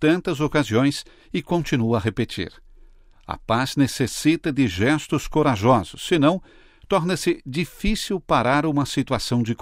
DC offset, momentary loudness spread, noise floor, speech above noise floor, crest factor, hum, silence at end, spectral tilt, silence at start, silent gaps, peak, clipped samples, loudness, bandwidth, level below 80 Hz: under 0.1%; 9 LU; -49 dBFS; 27 dB; 16 dB; none; 0.05 s; -5.5 dB/octave; 0 s; none; -4 dBFS; under 0.1%; -22 LUFS; 16 kHz; -40 dBFS